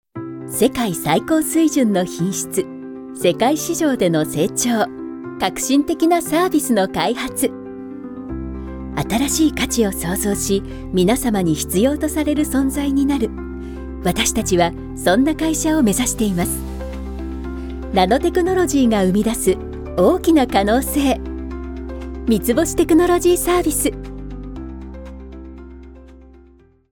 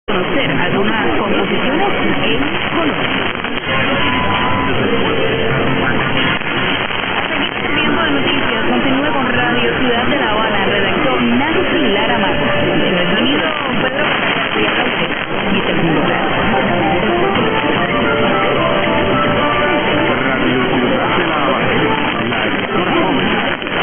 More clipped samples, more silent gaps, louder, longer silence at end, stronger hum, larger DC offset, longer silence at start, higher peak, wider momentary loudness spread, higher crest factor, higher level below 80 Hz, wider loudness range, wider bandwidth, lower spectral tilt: neither; neither; second, -18 LUFS vs -14 LUFS; first, 0.55 s vs 0 s; neither; neither; about the same, 0.15 s vs 0.1 s; about the same, -2 dBFS vs -2 dBFS; first, 15 LU vs 2 LU; about the same, 16 dB vs 12 dB; about the same, -34 dBFS vs -36 dBFS; about the same, 3 LU vs 1 LU; first, 18 kHz vs 13.5 kHz; second, -4.5 dB/octave vs -9 dB/octave